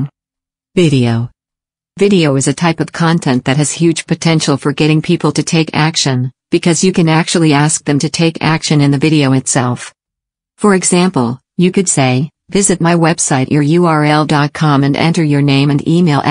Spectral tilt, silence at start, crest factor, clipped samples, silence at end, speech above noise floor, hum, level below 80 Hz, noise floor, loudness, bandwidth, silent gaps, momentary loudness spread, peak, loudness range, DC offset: -5 dB/octave; 0 s; 12 dB; under 0.1%; 0 s; 75 dB; none; -48 dBFS; -86 dBFS; -12 LUFS; 10.5 kHz; none; 5 LU; 0 dBFS; 2 LU; under 0.1%